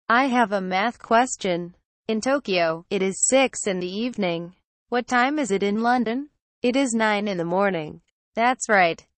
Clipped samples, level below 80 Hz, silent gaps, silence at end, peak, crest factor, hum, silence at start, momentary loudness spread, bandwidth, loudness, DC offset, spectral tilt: under 0.1%; -64 dBFS; 1.85-2.05 s, 4.65-4.86 s, 6.41-6.62 s, 8.11-8.32 s; 0.25 s; -6 dBFS; 16 dB; none; 0.1 s; 11 LU; 8.4 kHz; -22 LUFS; under 0.1%; -3.5 dB/octave